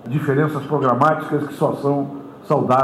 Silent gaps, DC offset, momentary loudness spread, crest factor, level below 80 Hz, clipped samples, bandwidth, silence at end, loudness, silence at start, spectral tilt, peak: none; under 0.1%; 8 LU; 16 dB; -66 dBFS; under 0.1%; 14.5 kHz; 0 s; -19 LUFS; 0 s; -8 dB/octave; -2 dBFS